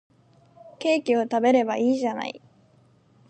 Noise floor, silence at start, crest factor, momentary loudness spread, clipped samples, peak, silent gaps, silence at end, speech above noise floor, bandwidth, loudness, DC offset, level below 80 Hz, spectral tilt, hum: -59 dBFS; 0.65 s; 18 dB; 13 LU; under 0.1%; -8 dBFS; none; 0.95 s; 36 dB; 9 kHz; -23 LUFS; under 0.1%; -78 dBFS; -5 dB/octave; none